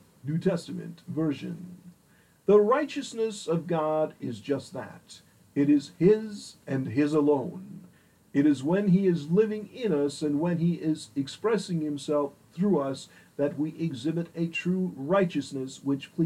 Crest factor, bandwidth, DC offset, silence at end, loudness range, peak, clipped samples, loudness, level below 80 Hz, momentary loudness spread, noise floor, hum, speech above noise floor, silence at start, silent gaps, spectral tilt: 18 dB; 12 kHz; under 0.1%; 0 s; 3 LU; -10 dBFS; under 0.1%; -28 LUFS; -70 dBFS; 15 LU; -61 dBFS; none; 34 dB; 0.25 s; none; -7 dB/octave